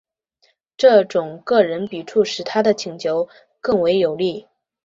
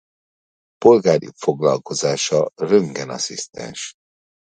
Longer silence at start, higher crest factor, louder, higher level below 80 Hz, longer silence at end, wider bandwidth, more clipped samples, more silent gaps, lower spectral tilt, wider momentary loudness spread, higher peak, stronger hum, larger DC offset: about the same, 0.8 s vs 0.8 s; about the same, 18 dB vs 20 dB; about the same, -19 LUFS vs -18 LUFS; about the same, -62 dBFS vs -60 dBFS; second, 0.45 s vs 0.7 s; second, 7.8 kHz vs 9.4 kHz; neither; neither; about the same, -5 dB/octave vs -4.5 dB/octave; second, 11 LU vs 16 LU; about the same, -2 dBFS vs 0 dBFS; neither; neither